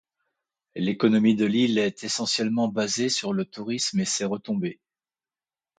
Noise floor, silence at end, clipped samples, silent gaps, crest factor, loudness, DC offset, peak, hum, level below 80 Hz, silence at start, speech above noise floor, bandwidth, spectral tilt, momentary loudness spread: under -90 dBFS; 1.05 s; under 0.1%; none; 18 dB; -25 LUFS; under 0.1%; -8 dBFS; none; -68 dBFS; 0.75 s; over 66 dB; 9.4 kHz; -4 dB/octave; 9 LU